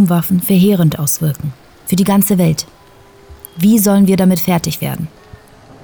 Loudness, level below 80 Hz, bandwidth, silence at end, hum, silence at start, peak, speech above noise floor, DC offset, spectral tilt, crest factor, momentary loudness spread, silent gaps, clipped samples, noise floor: -13 LUFS; -46 dBFS; over 20 kHz; 0.75 s; none; 0 s; -2 dBFS; 30 dB; under 0.1%; -6 dB/octave; 12 dB; 15 LU; none; under 0.1%; -43 dBFS